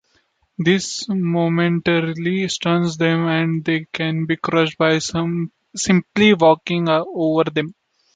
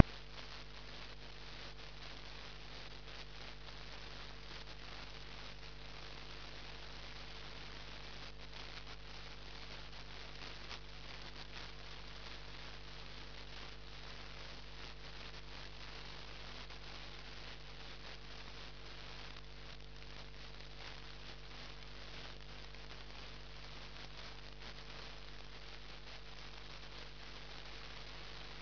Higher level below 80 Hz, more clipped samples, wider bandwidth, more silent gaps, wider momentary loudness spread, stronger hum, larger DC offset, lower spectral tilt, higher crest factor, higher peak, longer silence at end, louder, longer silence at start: about the same, -56 dBFS vs -56 dBFS; neither; first, 9.4 kHz vs 5.4 kHz; neither; first, 8 LU vs 2 LU; second, none vs 50 Hz at -55 dBFS; second, under 0.1% vs 0.3%; first, -5.5 dB/octave vs -2 dB/octave; second, 16 dB vs 40 dB; first, -2 dBFS vs -8 dBFS; first, 0.45 s vs 0 s; first, -19 LUFS vs -50 LUFS; first, 0.6 s vs 0 s